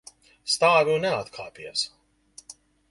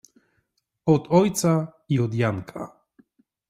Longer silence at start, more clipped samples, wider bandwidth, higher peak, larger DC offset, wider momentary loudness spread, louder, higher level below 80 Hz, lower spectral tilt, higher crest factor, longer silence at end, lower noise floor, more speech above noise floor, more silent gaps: second, 0.45 s vs 0.85 s; neither; second, 11.5 kHz vs 15.5 kHz; about the same, -6 dBFS vs -6 dBFS; neither; first, 20 LU vs 17 LU; about the same, -23 LUFS vs -23 LUFS; about the same, -64 dBFS vs -60 dBFS; second, -2.5 dB/octave vs -6.5 dB/octave; about the same, 22 dB vs 20 dB; second, 0.4 s vs 0.8 s; second, -53 dBFS vs -73 dBFS; second, 29 dB vs 51 dB; neither